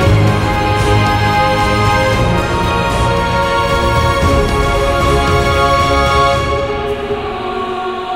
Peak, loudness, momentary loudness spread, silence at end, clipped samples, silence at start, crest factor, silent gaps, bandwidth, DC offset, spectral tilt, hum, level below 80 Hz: 0 dBFS; -13 LUFS; 7 LU; 0 s; under 0.1%; 0 s; 12 dB; none; 16 kHz; under 0.1%; -5.5 dB/octave; none; -22 dBFS